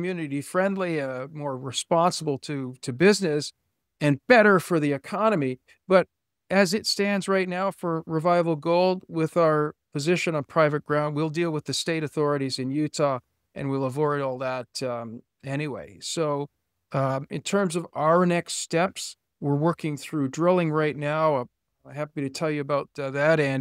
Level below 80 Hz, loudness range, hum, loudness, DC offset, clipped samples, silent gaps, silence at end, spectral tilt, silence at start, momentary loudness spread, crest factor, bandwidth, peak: -68 dBFS; 7 LU; none; -25 LUFS; under 0.1%; under 0.1%; none; 0 s; -5.5 dB/octave; 0 s; 11 LU; 22 dB; 16 kHz; -4 dBFS